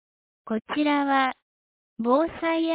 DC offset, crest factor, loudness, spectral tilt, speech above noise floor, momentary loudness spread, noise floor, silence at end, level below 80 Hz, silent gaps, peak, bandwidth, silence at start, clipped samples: under 0.1%; 16 dB; -25 LUFS; -8.5 dB/octave; over 66 dB; 10 LU; under -90 dBFS; 0 s; -62 dBFS; 1.42-1.96 s; -10 dBFS; 4 kHz; 0.45 s; under 0.1%